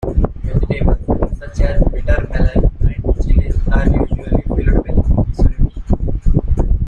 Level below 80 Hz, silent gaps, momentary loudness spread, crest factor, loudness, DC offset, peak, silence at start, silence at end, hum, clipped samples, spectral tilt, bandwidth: -14 dBFS; none; 4 LU; 12 dB; -18 LUFS; under 0.1%; -2 dBFS; 0 s; 0 s; none; under 0.1%; -9.5 dB/octave; 6.8 kHz